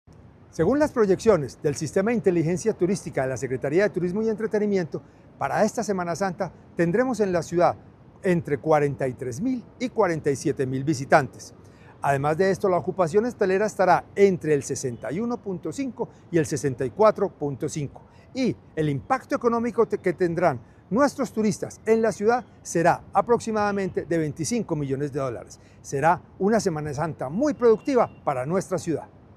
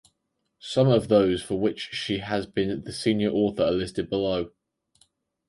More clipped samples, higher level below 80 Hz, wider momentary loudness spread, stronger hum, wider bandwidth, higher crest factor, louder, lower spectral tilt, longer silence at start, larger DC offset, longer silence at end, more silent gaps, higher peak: neither; about the same, -54 dBFS vs -52 dBFS; about the same, 9 LU vs 8 LU; neither; first, 14 kHz vs 11.5 kHz; about the same, 22 dB vs 18 dB; about the same, -24 LUFS vs -25 LUFS; about the same, -6 dB/octave vs -6.5 dB/octave; about the same, 0.55 s vs 0.65 s; neither; second, 0.3 s vs 1 s; neither; first, -2 dBFS vs -8 dBFS